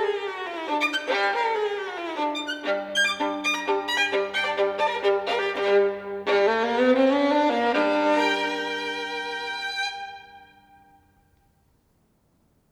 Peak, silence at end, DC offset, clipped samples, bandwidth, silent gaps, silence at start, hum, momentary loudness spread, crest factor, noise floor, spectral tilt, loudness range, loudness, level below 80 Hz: -10 dBFS; 2.25 s; under 0.1%; under 0.1%; 15.5 kHz; none; 0 s; none; 8 LU; 16 dB; -65 dBFS; -2.5 dB/octave; 10 LU; -24 LUFS; -70 dBFS